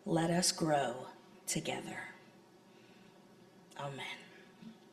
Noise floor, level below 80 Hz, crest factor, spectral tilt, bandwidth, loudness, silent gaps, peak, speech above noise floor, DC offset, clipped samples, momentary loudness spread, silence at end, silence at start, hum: -61 dBFS; -74 dBFS; 22 dB; -3.5 dB/octave; 14.5 kHz; -36 LUFS; none; -18 dBFS; 26 dB; under 0.1%; under 0.1%; 24 LU; 0.15 s; 0.05 s; none